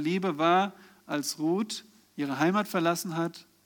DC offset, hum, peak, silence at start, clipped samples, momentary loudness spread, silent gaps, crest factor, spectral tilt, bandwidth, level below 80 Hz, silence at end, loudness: under 0.1%; none; -12 dBFS; 0 s; under 0.1%; 11 LU; none; 16 dB; -5 dB/octave; 19.5 kHz; -82 dBFS; 0.25 s; -29 LUFS